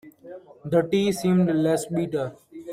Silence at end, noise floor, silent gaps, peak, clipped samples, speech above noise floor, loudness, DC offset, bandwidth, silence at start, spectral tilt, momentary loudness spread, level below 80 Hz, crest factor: 0 s; -44 dBFS; none; -8 dBFS; under 0.1%; 21 dB; -23 LUFS; under 0.1%; 15 kHz; 0.05 s; -6.5 dB/octave; 22 LU; -62 dBFS; 16 dB